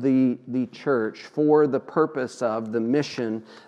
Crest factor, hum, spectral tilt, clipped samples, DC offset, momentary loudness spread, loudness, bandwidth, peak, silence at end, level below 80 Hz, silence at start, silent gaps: 16 dB; none; -7 dB/octave; under 0.1%; under 0.1%; 9 LU; -24 LUFS; 9.6 kHz; -6 dBFS; 0.1 s; -76 dBFS; 0 s; none